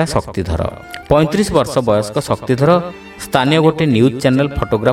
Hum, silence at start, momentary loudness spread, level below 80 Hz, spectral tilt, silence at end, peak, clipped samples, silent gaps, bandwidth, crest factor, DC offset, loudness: none; 0 s; 8 LU; -34 dBFS; -6 dB/octave; 0 s; 0 dBFS; under 0.1%; none; 16 kHz; 14 dB; under 0.1%; -15 LUFS